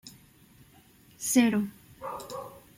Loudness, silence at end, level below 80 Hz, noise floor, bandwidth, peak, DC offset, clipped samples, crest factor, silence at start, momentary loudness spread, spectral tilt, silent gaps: -29 LUFS; 0.2 s; -66 dBFS; -58 dBFS; 16.5 kHz; -10 dBFS; under 0.1%; under 0.1%; 22 dB; 0.05 s; 19 LU; -4 dB/octave; none